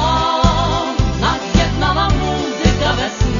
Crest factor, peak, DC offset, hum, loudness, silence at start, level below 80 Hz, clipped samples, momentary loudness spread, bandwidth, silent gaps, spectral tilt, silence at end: 16 dB; 0 dBFS; under 0.1%; none; -16 LUFS; 0 s; -22 dBFS; under 0.1%; 3 LU; 7.4 kHz; none; -5 dB/octave; 0 s